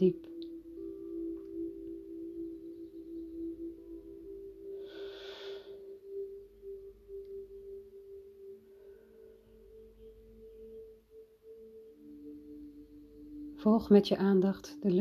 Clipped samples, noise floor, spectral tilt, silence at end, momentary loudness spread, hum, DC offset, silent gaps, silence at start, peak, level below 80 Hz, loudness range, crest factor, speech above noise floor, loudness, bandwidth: under 0.1%; -58 dBFS; -8 dB/octave; 0 s; 26 LU; none; under 0.1%; none; 0 s; -12 dBFS; -64 dBFS; 22 LU; 26 dB; 30 dB; -35 LUFS; 13.5 kHz